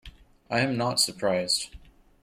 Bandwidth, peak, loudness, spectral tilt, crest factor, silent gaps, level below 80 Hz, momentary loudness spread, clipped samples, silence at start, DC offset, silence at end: 16.5 kHz; -10 dBFS; -26 LUFS; -3 dB/octave; 20 dB; none; -54 dBFS; 5 LU; under 0.1%; 0.05 s; under 0.1%; 0.45 s